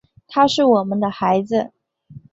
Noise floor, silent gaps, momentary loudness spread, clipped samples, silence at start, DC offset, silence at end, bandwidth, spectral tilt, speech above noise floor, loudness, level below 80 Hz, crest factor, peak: -43 dBFS; none; 9 LU; under 0.1%; 0.3 s; under 0.1%; 0.15 s; 8 kHz; -5.5 dB/octave; 27 dB; -18 LUFS; -60 dBFS; 16 dB; -2 dBFS